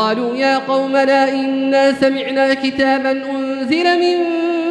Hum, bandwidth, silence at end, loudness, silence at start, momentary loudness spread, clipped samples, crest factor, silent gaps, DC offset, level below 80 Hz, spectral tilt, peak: none; 10 kHz; 0 s; -15 LUFS; 0 s; 4 LU; under 0.1%; 14 dB; none; under 0.1%; -58 dBFS; -4.5 dB/octave; -2 dBFS